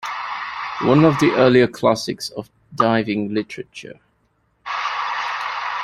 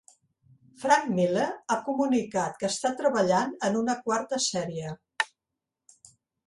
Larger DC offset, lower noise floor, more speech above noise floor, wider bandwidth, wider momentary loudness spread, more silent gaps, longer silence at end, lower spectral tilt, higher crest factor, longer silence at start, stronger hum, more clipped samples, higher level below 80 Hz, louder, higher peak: neither; second, -64 dBFS vs -87 dBFS; second, 47 dB vs 60 dB; first, 14 kHz vs 11.5 kHz; first, 20 LU vs 8 LU; neither; second, 0 s vs 1.2 s; first, -6 dB/octave vs -4 dB/octave; about the same, 18 dB vs 20 dB; second, 0 s vs 0.8 s; neither; neither; first, -56 dBFS vs -70 dBFS; first, -19 LUFS vs -27 LUFS; first, -2 dBFS vs -8 dBFS